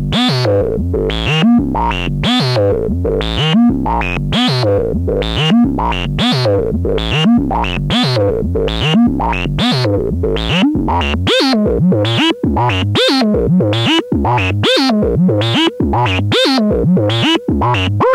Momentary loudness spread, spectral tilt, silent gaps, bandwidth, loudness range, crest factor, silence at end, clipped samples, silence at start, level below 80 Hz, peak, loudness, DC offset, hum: 5 LU; -6 dB/octave; none; 15 kHz; 2 LU; 10 dB; 0 s; under 0.1%; 0 s; -26 dBFS; -2 dBFS; -13 LUFS; under 0.1%; none